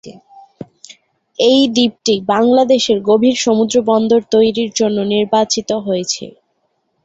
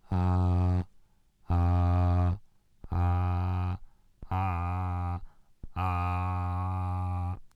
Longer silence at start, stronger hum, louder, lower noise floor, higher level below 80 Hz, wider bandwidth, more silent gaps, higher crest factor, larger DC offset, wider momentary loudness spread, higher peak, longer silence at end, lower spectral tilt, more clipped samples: about the same, 0.05 s vs 0.1 s; neither; first, -14 LUFS vs -30 LUFS; first, -65 dBFS vs -61 dBFS; second, -56 dBFS vs -42 dBFS; first, 8 kHz vs 4.9 kHz; neither; about the same, 14 dB vs 14 dB; neither; about the same, 9 LU vs 10 LU; first, -2 dBFS vs -16 dBFS; first, 0.75 s vs 0.1 s; second, -4 dB/octave vs -9.5 dB/octave; neither